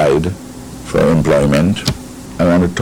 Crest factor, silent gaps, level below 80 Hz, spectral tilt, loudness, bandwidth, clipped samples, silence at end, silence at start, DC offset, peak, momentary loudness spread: 12 dB; none; -32 dBFS; -6.5 dB/octave; -14 LUFS; 17 kHz; under 0.1%; 0 s; 0 s; under 0.1%; -2 dBFS; 18 LU